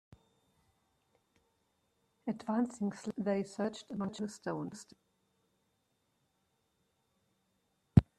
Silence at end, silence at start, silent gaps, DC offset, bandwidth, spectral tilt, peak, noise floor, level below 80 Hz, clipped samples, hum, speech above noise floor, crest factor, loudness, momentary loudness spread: 0.15 s; 2.25 s; none; under 0.1%; 11.5 kHz; -7.5 dB/octave; -8 dBFS; -79 dBFS; -56 dBFS; under 0.1%; none; 42 dB; 32 dB; -36 LUFS; 11 LU